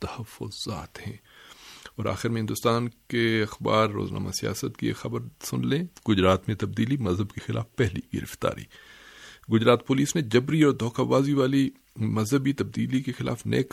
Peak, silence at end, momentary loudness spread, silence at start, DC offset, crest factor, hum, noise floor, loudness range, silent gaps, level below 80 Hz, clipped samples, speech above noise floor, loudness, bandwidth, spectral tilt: -6 dBFS; 0.05 s; 15 LU; 0 s; under 0.1%; 20 dB; none; -49 dBFS; 5 LU; none; -54 dBFS; under 0.1%; 23 dB; -26 LUFS; 16 kHz; -6 dB/octave